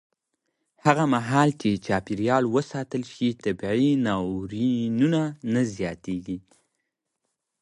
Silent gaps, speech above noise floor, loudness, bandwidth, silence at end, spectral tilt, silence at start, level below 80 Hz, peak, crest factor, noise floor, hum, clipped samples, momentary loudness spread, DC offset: none; 56 dB; -25 LUFS; 11.5 kHz; 1.2 s; -6.5 dB/octave; 0.85 s; -56 dBFS; -4 dBFS; 22 dB; -80 dBFS; none; under 0.1%; 10 LU; under 0.1%